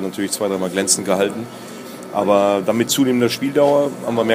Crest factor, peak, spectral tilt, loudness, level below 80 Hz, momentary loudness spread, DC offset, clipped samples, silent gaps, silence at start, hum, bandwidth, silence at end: 16 dB; 0 dBFS; -4 dB/octave; -18 LUFS; -64 dBFS; 15 LU; under 0.1%; under 0.1%; none; 0 s; none; 15.5 kHz; 0 s